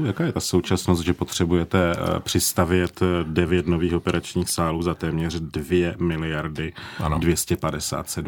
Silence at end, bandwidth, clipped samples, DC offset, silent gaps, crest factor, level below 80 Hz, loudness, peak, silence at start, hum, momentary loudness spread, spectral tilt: 0 s; 19.5 kHz; under 0.1%; under 0.1%; none; 20 dB; -44 dBFS; -23 LUFS; -4 dBFS; 0 s; none; 6 LU; -5 dB/octave